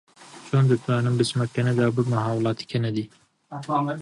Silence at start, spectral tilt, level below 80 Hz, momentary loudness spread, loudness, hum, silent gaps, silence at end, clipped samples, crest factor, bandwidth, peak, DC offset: 0.2 s; -7 dB/octave; -62 dBFS; 14 LU; -24 LUFS; none; none; 0 s; under 0.1%; 16 dB; 11 kHz; -8 dBFS; under 0.1%